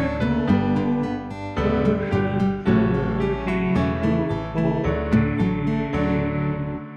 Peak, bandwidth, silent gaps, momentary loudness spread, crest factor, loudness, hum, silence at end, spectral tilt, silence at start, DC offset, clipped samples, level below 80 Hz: -8 dBFS; 8 kHz; none; 5 LU; 14 dB; -22 LUFS; none; 0 s; -9 dB/octave; 0 s; under 0.1%; under 0.1%; -36 dBFS